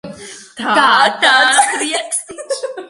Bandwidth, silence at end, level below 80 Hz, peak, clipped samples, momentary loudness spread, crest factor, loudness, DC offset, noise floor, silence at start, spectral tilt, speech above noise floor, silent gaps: 11.5 kHz; 0.05 s; -62 dBFS; 0 dBFS; under 0.1%; 18 LU; 14 dB; -12 LUFS; under 0.1%; -33 dBFS; 0.05 s; 0 dB/octave; 20 dB; none